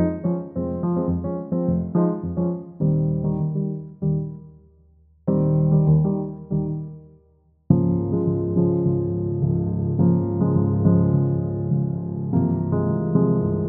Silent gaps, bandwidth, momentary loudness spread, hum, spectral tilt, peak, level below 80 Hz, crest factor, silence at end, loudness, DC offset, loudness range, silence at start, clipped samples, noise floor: none; 2.3 kHz; 8 LU; none; -16 dB/octave; -2 dBFS; -44 dBFS; 20 dB; 0 s; -22 LUFS; under 0.1%; 3 LU; 0 s; under 0.1%; -59 dBFS